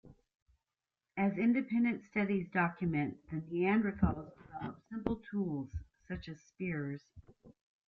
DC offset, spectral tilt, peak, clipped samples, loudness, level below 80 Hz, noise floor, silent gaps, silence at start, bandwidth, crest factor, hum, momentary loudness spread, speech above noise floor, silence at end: under 0.1%; -9 dB/octave; -16 dBFS; under 0.1%; -36 LUFS; -56 dBFS; under -90 dBFS; 0.42-0.46 s; 0.05 s; 6.4 kHz; 20 dB; none; 15 LU; over 55 dB; 0.35 s